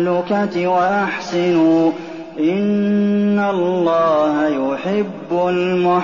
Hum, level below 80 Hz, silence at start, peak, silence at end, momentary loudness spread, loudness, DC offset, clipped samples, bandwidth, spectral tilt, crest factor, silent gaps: none; -60 dBFS; 0 s; -6 dBFS; 0 s; 6 LU; -17 LUFS; 0.2%; under 0.1%; 7.2 kHz; -5.5 dB/octave; 10 dB; none